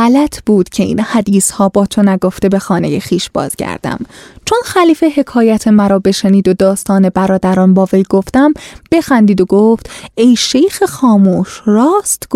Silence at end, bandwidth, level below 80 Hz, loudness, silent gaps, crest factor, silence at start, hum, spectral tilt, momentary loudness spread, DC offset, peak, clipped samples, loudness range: 0 s; 15 kHz; -42 dBFS; -11 LUFS; none; 10 dB; 0 s; none; -5.5 dB/octave; 8 LU; under 0.1%; 0 dBFS; under 0.1%; 3 LU